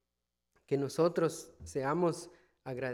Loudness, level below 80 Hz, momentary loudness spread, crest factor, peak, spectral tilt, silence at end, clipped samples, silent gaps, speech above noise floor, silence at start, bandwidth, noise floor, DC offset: -34 LUFS; -66 dBFS; 15 LU; 18 dB; -16 dBFS; -6 dB/octave; 0 s; under 0.1%; none; 54 dB; 0.7 s; 16 kHz; -87 dBFS; under 0.1%